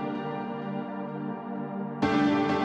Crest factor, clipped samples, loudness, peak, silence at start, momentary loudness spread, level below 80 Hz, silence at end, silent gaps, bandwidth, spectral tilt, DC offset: 18 dB; under 0.1%; -30 LUFS; -12 dBFS; 0 s; 11 LU; -62 dBFS; 0 s; none; 7.8 kHz; -7 dB/octave; under 0.1%